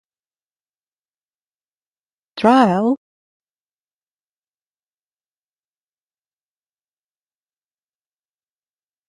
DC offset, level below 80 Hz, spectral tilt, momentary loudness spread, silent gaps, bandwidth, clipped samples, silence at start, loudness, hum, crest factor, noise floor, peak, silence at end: under 0.1%; -66 dBFS; -7 dB/octave; 14 LU; none; 11.5 kHz; under 0.1%; 2.35 s; -16 LUFS; none; 24 dB; under -90 dBFS; 0 dBFS; 6.15 s